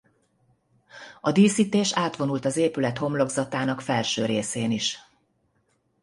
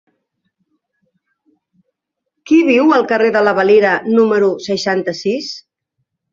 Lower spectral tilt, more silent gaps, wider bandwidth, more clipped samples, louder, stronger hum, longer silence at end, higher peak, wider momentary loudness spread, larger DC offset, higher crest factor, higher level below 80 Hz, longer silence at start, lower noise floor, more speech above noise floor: about the same, -4.5 dB/octave vs -5.5 dB/octave; neither; first, 11.5 kHz vs 7.6 kHz; neither; second, -24 LUFS vs -13 LUFS; neither; first, 1 s vs 0.75 s; second, -6 dBFS vs -2 dBFS; about the same, 9 LU vs 9 LU; neither; about the same, 18 dB vs 14 dB; about the same, -64 dBFS vs -62 dBFS; second, 0.95 s vs 2.45 s; second, -69 dBFS vs -75 dBFS; second, 46 dB vs 62 dB